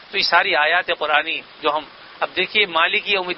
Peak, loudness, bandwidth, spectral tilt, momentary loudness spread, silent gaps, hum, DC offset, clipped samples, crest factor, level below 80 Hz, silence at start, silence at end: -2 dBFS; -18 LUFS; 6 kHz; -5 dB/octave; 9 LU; none; none; under 0.1%; under 0.1%; 18 dB; -60 dBFS; 0 s; 0 s